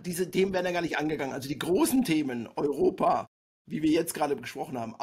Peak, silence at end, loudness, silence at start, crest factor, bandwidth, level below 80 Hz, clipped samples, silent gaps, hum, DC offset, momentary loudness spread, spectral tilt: -12 dBFS; 0 s; -28 LUFS; 0 s; 16 dB; 16 kHz; -60 dBFS; under 0.1%; 3.27-3.65 s; none; under 0.1%; 10 LU; -5 dB/octave